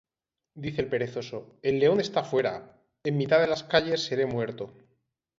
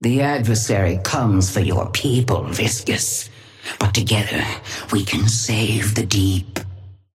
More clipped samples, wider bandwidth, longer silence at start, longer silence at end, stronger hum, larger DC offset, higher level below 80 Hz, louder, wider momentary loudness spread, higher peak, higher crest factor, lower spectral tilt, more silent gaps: neither; second, 7.8 kHz vs 16 kHz; first, 0.55 s vs 0 s; first, 0.7 s vs 0.2 s; neither; neither; second, -62 dBFS vs -42 dBFS; second, -27 LUFS vs -19 LUFS; first, 14 LU vs 8 LU; second, -8 dBFS vs -4 dBFS; about the same, 20 dB vs 16 dB; about the same, -5.5 dB/octave vs -4.5 dB/octave; neither